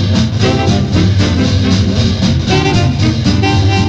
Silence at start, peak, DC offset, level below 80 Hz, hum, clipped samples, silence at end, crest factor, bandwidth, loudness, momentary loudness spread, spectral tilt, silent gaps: 0 s; -2 dBFS; under 0.1%; -24 dBFS; none; under 0.1%; 0 s; 8 dB; 8.2 kHz; -12 LUFS; 1 LU; -6 dB/octave; none